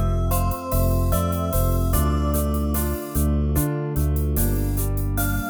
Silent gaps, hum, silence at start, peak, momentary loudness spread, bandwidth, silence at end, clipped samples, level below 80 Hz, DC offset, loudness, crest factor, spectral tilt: none; none; 0 s; -8 dBFS; 3 LU; over 20 kHz; 0 s; under 0.1%; -24 dBFS; under 0.1%; -23 LUFS; 14 dB; -6.5 dB/octave